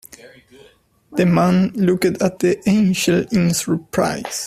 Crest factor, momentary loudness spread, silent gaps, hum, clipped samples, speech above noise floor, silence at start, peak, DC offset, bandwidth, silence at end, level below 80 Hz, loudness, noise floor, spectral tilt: 16 dB; 5 LU; none; none; under 0.1%; 36 dB; 0.25 s; -2 dBFS; under 0.1%; 15 kHz; 0 s; -52 dBFS; -17 LUFS; -53 dBFS; -5.5 dB/octave